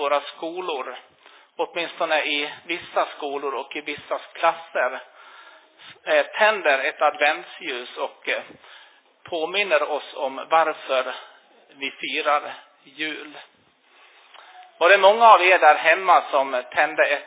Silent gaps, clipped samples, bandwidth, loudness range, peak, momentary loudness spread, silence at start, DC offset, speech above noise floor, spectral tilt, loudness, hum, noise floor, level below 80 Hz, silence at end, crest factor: none; under 0.1%; 4 kHz; 10 LU; -2 dBFS; 17 LU; 0 s; under 0.1%; 36 dB; -5.5 dB/octave; -21 LUFS; none; -58 dBFS; -80 dBFS; 0 s; 20 dB